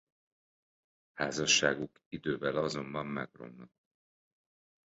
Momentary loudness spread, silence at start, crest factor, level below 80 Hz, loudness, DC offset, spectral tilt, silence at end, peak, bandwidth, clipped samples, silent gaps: 21 LU; 1.15 s; 24 dB; -68 dBFS; -32 LUFS; under 0.1%; -2 dB/octave; 1.25 s; -12 dBFS; 7.6 kHz; under 0.1%; 2.06-2.11 s